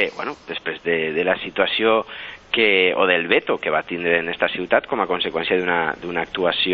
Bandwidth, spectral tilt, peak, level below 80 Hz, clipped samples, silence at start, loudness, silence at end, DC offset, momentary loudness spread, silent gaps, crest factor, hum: 6.8 kHz; -5.5 dB/octave; -2 dBFS; -56 dBFS; under 0.1%; 0 s; -20 LUFS; 0 s; under 0.1%; 9 LU; none; 18 dB; none